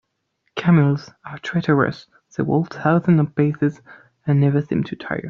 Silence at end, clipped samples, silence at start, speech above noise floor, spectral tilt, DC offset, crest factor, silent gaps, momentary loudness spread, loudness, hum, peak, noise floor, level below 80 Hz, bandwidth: 0 s; under 0.1%; 0.55 s; 52 dB; -7.5 dB/octave; under 0.1%; 16 dB; none; 15 LU; -20 LUFS; none; -4 dBFS; -71 dBFS; -56 dBFS; 6.8 kHz